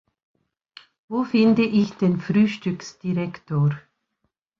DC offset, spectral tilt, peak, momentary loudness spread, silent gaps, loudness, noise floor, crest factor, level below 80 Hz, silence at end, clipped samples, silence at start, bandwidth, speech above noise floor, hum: under 0.1%; -7.5 dB/octave; -8 dBFS; 12 LU; none; -22 LUFS; -75 dBFS; 16 dB; -62 dBFS; 0.8 s; under 0.1%; 1.1 s; 7.2 kHz; 55 dB; none